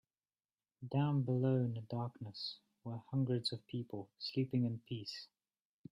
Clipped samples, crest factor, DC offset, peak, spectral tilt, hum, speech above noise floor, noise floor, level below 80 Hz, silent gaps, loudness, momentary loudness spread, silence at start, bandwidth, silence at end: under 0.1%; 16 dB; under 0.1%; -24 dBFS; -7.5 dB/octave; none; over 52 dB; under -90 dBFS; -78 dBFS; none; -39 LUFS; 14 LU; 0.8 s; 10.5 kHz; 0.65 s